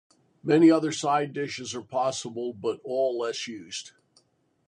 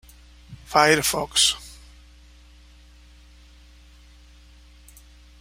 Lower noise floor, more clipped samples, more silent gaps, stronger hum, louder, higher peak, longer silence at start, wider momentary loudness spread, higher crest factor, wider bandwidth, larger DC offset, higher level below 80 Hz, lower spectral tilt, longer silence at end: first, -67 dBFS vs -50 dBFS; neither; neither; second, none vs 60 Hz at -50 dBFS; second, -26 LUFS vs -19 LUFS; second, -8 dBFS vs -2 dBFS; about the same, 0.45 s vs 0.5 s; about the same, 16 LU vs 14 LU; second, 18 dB vs 26 dB; second, 10.5 kHz vs 16 kHz; neither; second, -74 dBFS vs -48 dBFS; first, -5 dB/octave vs -1.5 dB/octave; second, 0.8 s vs 3.7 s